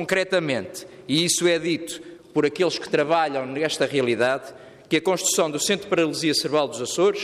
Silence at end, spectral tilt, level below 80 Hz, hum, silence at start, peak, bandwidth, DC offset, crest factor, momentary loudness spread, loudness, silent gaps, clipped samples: 0 s; -3 dB/octave; -66 dBFS; none; 0 s; -8 dBFS; 15 kHz; under 0.1%; 14 dB; 8 LU; -22 LUFS; none; under 0.1%